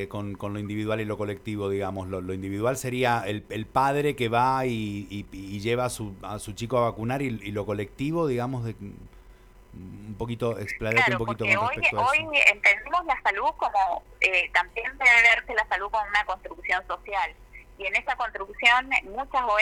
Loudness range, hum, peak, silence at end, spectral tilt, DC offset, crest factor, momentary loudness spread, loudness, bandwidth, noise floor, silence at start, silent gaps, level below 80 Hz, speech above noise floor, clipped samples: 8 LU; none; -2 dBFS; 0 s; -4.5 dB/octave; under 0.1%; 24 dB; 14 LU; -25 LUFS; 19.5 kHz; -51 dBFS; 0 s; none; -50 dBFS; 25 dB; under 0.1%